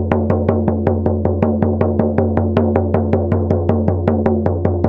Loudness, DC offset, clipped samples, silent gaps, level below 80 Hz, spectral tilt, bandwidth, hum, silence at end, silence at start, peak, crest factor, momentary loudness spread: -16 LUFS; under 0.1%; under 0.1%; none; -34 dBFS; -11.5 dB/octave; 3.9 kHz; none; 0 s; 0 s; 0 dBFS; 14 dB; 1 LU